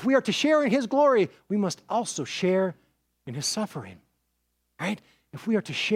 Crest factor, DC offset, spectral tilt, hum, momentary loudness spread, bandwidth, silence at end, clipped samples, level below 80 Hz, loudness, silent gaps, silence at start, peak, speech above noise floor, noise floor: 16 dB; under 0.1%; -4.5 dB/octave; none; 16 LU; 16 kHz; 0 s; under 0.1%; -72 dBFS; -26 LUFS; none; 0 s; -10 dBFS; 50 dB; -75 dBFS